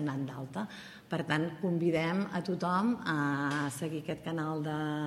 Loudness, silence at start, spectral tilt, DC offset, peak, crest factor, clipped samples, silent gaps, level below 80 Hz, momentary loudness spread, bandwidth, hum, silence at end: -33 LUFS; 0 s; -6.5 dB/octave; under 0.1%; -14 dBFS; 18 dB; under 0.1%; none; -70 dBFS; 9 LU; 15.5 kHz; none; 0 s